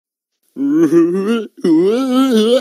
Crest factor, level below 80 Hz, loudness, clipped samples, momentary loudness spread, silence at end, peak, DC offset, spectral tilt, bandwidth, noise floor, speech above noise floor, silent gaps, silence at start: 12 dB; -70 dBFS; -14 LUFS; under 0.1%; 6 LU; 0 s; -2 dBFS; under 0.1%; -6 dB/octave; 14.5 kHz; -67 dBFS; 54 dB; none; 0.55 s